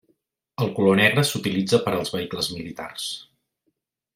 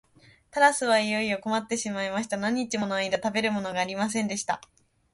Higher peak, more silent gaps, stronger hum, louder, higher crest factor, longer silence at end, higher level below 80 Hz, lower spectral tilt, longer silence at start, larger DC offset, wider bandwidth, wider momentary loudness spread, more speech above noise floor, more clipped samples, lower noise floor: first, -2 dBFS vs -6 dBFS; neither; neither; first, -22 LUFS vs -27 LUFS; about the same, 22 dB vs 22 dB; first, 0.9 s vs 0.55 s; about the same, -62 dBFS vs -66 dBFS; about the same, -4.5 dB/octave vs -3.5 dB/octave; about the same, 0.6 s vs 0.55 s; neither; first, 16 kHz vs 11.5 kHz; first, 16 LU vs 8 LU; first, 52 dB vs 31 dB; neither; first, -75 dBFS vs -57 dBFS